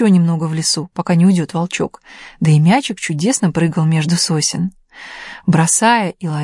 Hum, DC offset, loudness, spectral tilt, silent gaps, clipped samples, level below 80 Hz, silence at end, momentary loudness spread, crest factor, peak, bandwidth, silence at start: none; under 0.1%; -15 LUFS; -5 dB/octave; none; under 0.1%; -54 dBFS; 0 s; 11 LU; 14 dB; -2 dBFS; 11.5 kHz; 0 s